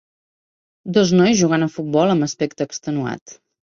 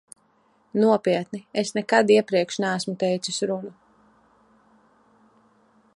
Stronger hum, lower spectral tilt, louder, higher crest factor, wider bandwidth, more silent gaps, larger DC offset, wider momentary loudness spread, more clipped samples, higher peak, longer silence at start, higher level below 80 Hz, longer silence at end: neither; about the same, -5.5 dB/octave vs -4.5 dB/octave; first, -18 LUFS vs -23 LUFS; second, 16 dB vs 22 dB; second, 7.4 kHz vs 11.5 kHz; first, 3.21-3.26 s vs none; neither; about the same, 12 LU vs 11 LU; neither; about the same, -4 dBFS vs -4 dBFS; about the same, 0.85 s vs 0.75 s; first, -58 dBFS vs -74 dBFS; second, 0.45 s vs 2.25 s